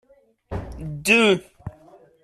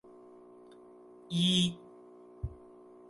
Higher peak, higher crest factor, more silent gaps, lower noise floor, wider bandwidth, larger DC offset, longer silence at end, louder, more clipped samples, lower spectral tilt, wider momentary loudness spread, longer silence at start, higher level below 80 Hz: first, -4 dBFS vs -16 dBFS; about the same, 20 dB vs 20 dB; neither; second, -51 dBFS vs -55 dBFS; first, 14 kHz vs 11.5 kHz; neither; about the same, 0.55 s vs 0.55 s; first, -18 LUFS vs -31 LUFS; neither; about the same, -4 dB/octave vs -4.5 dB/octave; second, 24 LU vs 28 LU; second, 0.5 s vs 1.3 s; first, -44 dBFS vs -56 dBFS